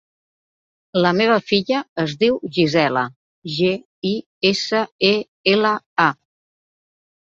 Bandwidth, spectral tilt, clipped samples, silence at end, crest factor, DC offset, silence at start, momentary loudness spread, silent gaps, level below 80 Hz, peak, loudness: 7.6 kHz; -5 dB/octave; under 0.1%; 1.15 s; 18 dB; under 0.1%; 0.95 s; 8 LU; 1.89-1.96 s, 3.16-3.42 s, 3.85-4.02 s, 4.26-4.41 s, 4.91-4.99 s, 5.28-5.44 s, 5.86-5.96 s; -60 dBFS; -2 dBFS; -19 LUFS